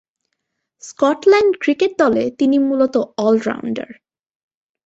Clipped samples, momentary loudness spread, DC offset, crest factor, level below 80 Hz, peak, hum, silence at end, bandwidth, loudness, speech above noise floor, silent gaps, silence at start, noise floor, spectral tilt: under 0.1%; 12 LU; under 0.1%; 16 dB; -60 dBFS; -2 dBFS; none; 1.05 s; 8 kHz; -16 LUFS; 59 dB; none; 0.85 s; -75 dBFS; -5 dB/octave